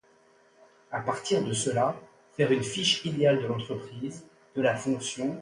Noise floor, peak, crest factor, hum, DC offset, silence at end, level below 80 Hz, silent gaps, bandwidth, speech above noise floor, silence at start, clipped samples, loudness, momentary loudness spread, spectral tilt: -61 dBFS; -10 dBFS; 18 dB; none; under 0.1%; 0 s; -66 dBFS; none; 11.5 kHz; 33 dB; 0.9 s; under 0.1%; -28 LUFS; 13 LU; -4 dB/octave